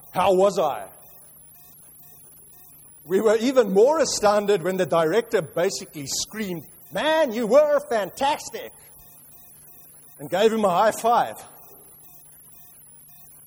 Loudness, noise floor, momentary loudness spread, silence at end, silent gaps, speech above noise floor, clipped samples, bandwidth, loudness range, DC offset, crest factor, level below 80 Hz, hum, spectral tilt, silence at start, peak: -21 LUFS; -48 dBFS; 16 LU; 2 s; none; 27 dB; under 0.1%; over 20 kHz; 5 LU; under 0.1%; 18 dB; -62 dBFS; none; -4 dB/octave; 0.15 s; -6 dBFS